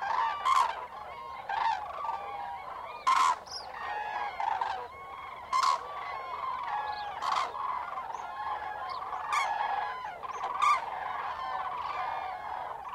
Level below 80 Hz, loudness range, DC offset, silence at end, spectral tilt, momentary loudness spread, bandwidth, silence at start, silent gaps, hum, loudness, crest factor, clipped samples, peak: -66 dBFS; 3 LU; under 0.1%; 0 s; -1 dB/octave; 12 LU; 16 kHz; 0 s; none; none; -33 LUFS; 20 dB; under 0.1%; -12 dBFS